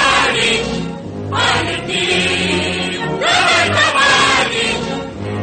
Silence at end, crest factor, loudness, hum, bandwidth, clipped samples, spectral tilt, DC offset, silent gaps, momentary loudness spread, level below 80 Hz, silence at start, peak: 0 s; 14 dB; -14 LUFS; none; 9.2 kHz; under 0.1%; -3 dB/octave; under 0.1%; none; 12 LU; -40 dBFS; 0 s; 0 dBFS